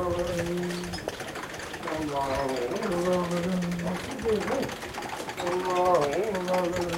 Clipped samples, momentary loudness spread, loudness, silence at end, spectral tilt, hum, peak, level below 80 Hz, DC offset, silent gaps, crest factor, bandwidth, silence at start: under 0.1%; 10 LU; -29 LUFS; 0 s; -5 dB/octave; none; -12 dBFS; -50 dBFS; under 0.1%; none; 18 dB; 16.5 kHz; 0 s